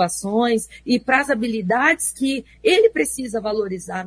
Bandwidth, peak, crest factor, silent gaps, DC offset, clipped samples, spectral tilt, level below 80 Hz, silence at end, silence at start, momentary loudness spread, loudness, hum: 11 kHz; -2 dBFS; 18 dB; none; under 0.1%; under 0.1%; -3.5 dB/octave; -52 dBFS; 0 s; 0 s; 8 LU; -19 LUFS; none